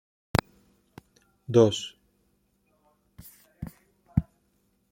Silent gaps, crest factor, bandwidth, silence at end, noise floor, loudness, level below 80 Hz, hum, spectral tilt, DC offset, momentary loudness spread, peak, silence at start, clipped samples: none; 30 dB; 16.5 kHz; 0.7 s; -70 dBFS; -26 LUFS; -48 dBFS; none; -6 dB/octave; under 0.1%; 26 LU; -2 dBFS; 0.35 s; under 0.1%